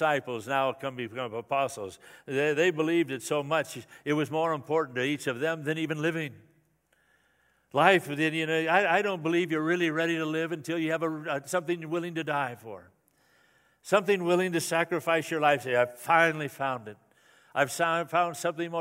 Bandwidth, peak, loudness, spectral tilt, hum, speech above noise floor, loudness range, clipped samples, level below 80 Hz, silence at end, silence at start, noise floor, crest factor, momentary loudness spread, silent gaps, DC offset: 16 kHz; -4 dBFS; -28 LUFS; -4.5 dB/octave; none; 41 dB; 5 LU; under 0.1%; -78 dBFS; 0 s; 0 s; -69 dBFS; 24 dB; 11 LU; none; under 0.1%